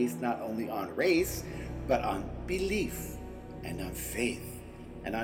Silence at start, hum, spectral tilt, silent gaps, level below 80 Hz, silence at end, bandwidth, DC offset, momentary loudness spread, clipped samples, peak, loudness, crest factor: 0 s; none; -5 dB/octave; none; -46 dBFS; 0 s; 17.5 kHz; under 0.1%; 14 LU; under 0.1%; -16 dBFS; -33 LUFS; 18 dB